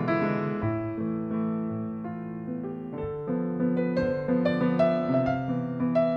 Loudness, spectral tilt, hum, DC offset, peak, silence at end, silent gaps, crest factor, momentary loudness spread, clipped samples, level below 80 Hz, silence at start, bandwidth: -28 LUFS; -9.5 dB/octave; none; under 0.1%; -10 dBFS; 0 s; none; 16 dB; 10 LU; under 0.1%; -56 dBFS; 0 s; 6 kHz